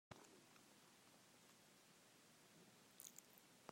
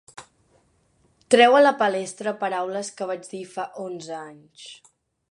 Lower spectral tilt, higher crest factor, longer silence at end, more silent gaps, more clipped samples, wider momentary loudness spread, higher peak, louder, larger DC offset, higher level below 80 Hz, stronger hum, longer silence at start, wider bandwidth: about the same, -2.5 dB/octave vs -3 dB/octave; first, 30 dB vs 22 dB; second, 0 s vs 0.55 s; neither; neither; second, 8 LU vs 27 LU; second, -36 dBFS vs -2 dBFS; second, -66 LUFS vs -21 LUFS; neither; second, under -90 dBFS vs -74 dBFS; neither; about the same, 0.1 s vs 0.2 s; first, 16 kHz vs 11 kHz